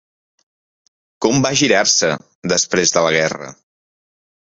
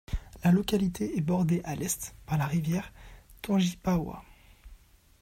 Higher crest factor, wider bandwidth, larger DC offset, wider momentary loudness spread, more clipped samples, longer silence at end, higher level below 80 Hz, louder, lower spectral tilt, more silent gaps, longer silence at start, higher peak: about the same, 18 dB vs 16 dB; second, 8 kHz vs 16 kHz; neither; second, 11 LU vs 14 LU; neither; first, 1.05 s vs 0.45 s; second, -54 dBFS vs -46 dBFS; first, -15 LUFS vs -29 LUFS; second, -2.5 dB/octave vs -6 dB/octave; first, 2.35-2.42 s vs none; first, 1.2 s vs 0.1 s; first, 0 dBFS vs -14 dBFS